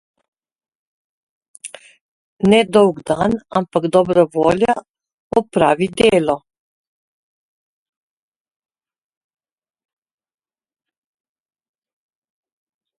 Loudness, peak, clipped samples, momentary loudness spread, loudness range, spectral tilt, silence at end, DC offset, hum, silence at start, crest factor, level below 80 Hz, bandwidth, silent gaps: -16 LUFS; 0 dBFS; under 0.1%; 11 LU; 5 LU; -6 dB/octave; 6.6 s; under 0.1%; none; 1.65 s; 20 dB; -52 dBFS; 11.5 kHz; 2.01-2.37 s, 4.90-4.94 s, 5.14-5.30 s